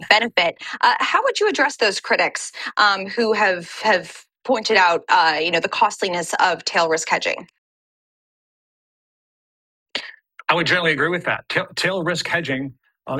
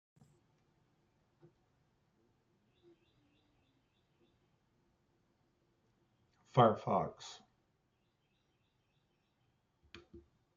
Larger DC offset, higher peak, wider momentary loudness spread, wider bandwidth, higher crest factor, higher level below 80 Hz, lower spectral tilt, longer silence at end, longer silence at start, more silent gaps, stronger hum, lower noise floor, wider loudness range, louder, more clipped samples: neither; first, 0 dBFS vs -14 dBFS; second, 11 LU vs 22 LU; first, 14 kHz vs 7.2 kHz; second, 20 dB vs 30 dB; first, -66 dBFS vs -78 dBFS; second, -3 dB/octave vs -6 dB/octave; second, 0 s vs 0.4 s; second, 0 s vs 6.55 s; first, 7.58-9.86 s vs none; neither; second, -40 dBFS vs -79 dBFS; about the same, 8 LU vs 7 LU; first, -19 LUFS vs -33 LUFS; neither